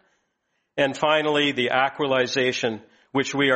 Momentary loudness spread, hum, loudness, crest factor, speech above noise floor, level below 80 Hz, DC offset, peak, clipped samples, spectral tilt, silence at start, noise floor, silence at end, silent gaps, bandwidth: 9 LU; none; -22 LUFS; 18 dB; 52 dB; -66 dBFS; under 0.1%; -4 dBFS; under 0.1%; -4 dB/octave; 0.75 s; -74 dBFS; 0 s; none; 8.4 kHz